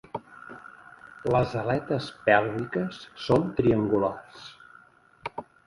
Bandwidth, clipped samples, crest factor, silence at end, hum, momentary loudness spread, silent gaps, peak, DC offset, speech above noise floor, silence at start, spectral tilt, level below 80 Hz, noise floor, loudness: 11.5 kHz; under 0.1%; 24 dB; 0.25 s; none; 22 LU; none; -4 dBFS; under 0.1%; 30 dB; 0.15 s; -7.5 dB/octave; -54 dBFS; -56 dBFS; -26 LUFS